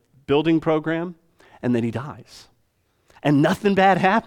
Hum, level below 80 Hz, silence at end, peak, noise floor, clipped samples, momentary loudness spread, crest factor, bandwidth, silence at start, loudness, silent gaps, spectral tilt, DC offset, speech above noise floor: none; -58 dBFS; 0.05 s; -4 dBFS; -66 dBFS; under 0.1%; 16 LU; 18 dB; 15.5 kHz; 0.3 s; -20 LUFS; none; -7 dB/octave; under 0.1%; 46 dB